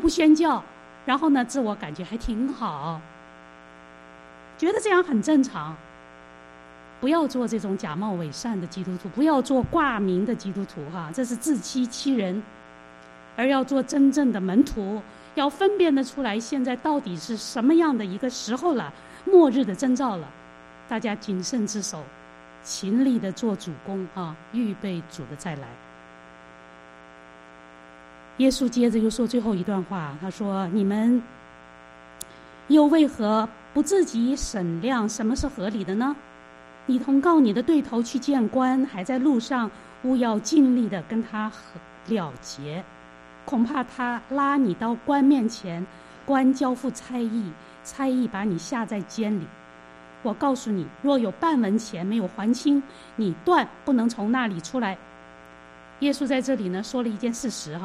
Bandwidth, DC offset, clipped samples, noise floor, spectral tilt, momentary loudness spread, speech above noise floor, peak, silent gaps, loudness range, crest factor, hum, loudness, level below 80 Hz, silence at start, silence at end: 13 kHz; under 0.1%; under 0.1%; -47 dBFS; -5.5 dB/octave; 14 LU; 24 dB; -6 dBFS; none; 6 LU; 20 dB; none; -24 LUFS; -52 dBFS; 0 s; 0 s